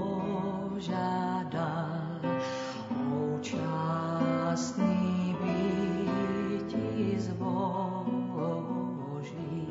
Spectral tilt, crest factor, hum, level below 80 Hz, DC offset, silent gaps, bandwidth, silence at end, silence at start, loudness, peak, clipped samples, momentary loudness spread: -7 dB/octave; 16 dB; none; -64 dBFS; under 0.1%; none; 7.8 kHz; 0 s; 0 s; -32 LUFS; -16 dBFS; under 0.1%; 6 LU